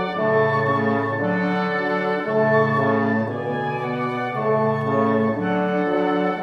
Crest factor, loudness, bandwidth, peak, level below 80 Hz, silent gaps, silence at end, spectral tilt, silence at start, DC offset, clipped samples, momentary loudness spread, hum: 16 dB; -21 LUFS; 7 kHz; -6 dBFS; -64 dBFS; none; 0 s; -8.5 dB/octave; 0 s; under 0.1%; under 0.1%; 6 LU; none